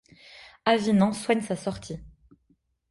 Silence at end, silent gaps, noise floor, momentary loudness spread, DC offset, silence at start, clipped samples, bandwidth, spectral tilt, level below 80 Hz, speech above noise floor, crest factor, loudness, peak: 0.85 s; none; -68 dBFS; 20 LU; under 0.1%; 0.35 s; under 0.1%; 11.5 kHz; -5.5 dB/octave; -56 dBFS; 44 dB; 20 dB; -25 LUFS; -8 dBFS